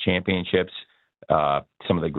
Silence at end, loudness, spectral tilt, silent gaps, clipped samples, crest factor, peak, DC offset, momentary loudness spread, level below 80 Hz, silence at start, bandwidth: 0 s; -24 LUFS; -9.5 dB/octave; none; under 0.1%; 20 dB; -4 dBFS; under 0.1%; 8 LU; -50 dBFS; 0 s; 4.3 kHz